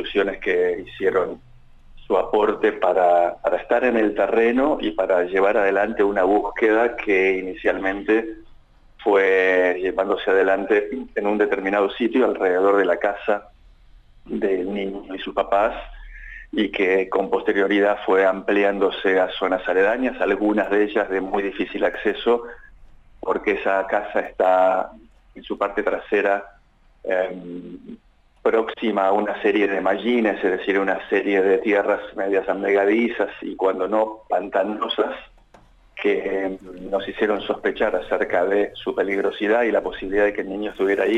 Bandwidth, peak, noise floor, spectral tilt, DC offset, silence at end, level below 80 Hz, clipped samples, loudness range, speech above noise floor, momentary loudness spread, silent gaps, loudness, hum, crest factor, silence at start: 8 kHz; -6 dBFS; -54 dBFS; -6 dB/octave; under 0.1%; 0 s; -50 dBFS; under 0.1%; 5 LU; 34 dB; 8 LU; none; -21 LUFS; none; 14 dB; 0 s